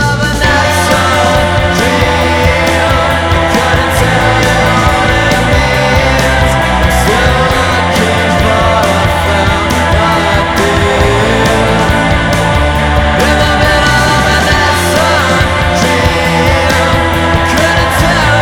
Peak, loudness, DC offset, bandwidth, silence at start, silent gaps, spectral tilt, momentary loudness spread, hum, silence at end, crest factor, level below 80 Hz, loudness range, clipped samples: 0 dBFS; -9 LUFS; under 0.1%; 19.5 kHz; 0 s; none; -4.5 dB/octave; 2 LU; none; 0 s; 8 dB; -18 dBFS; 1 LU; 0.2%